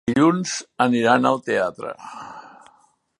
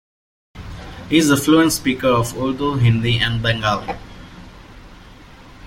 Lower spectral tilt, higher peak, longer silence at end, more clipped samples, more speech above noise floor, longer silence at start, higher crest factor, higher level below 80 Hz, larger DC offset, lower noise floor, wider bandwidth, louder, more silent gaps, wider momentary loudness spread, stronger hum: about the same, -5 dB/octave vs -5 dB/octave; about the same, -2 dBFS vs -2 dBFS; first, 0.7 s vs 0 s; neither; first, 39 dB vs 25 dB; second, 0.05 s vs 0.55 s; about the same, 20 dB vs 18 dB; second, -60 dBFS vs -40 dBFS; neither; first, -59 dBFS vs -42 dBFS; second, 11.5 kHz vs 16.5 kHz; second, -20 LUFS vs -17 LUFS; neither; about the same, 20 LU vs 21 LU; neither